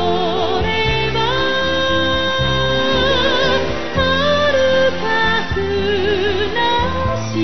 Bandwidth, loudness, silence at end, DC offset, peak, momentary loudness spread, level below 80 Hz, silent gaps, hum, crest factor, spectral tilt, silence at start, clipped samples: 6.4 kHz; -16 LUFS; 0 s; 5%; -4 dBFS; 4 LU; -32 dBFS; none; none; 14 dB; -5 dB/octave; 0 s; under 0.1%